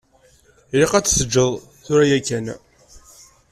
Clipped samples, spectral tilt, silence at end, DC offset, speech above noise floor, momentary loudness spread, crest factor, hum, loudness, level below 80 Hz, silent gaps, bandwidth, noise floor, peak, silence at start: under 0.1%; -4 dB/octave; 0.55 s; under 0.1%; 37 dB; 15 LU; 18 dB; none; -18 LUFS; -42 dBFS; none; 15 kHz; -54 dBFS; -2 dBFS; 0.75 s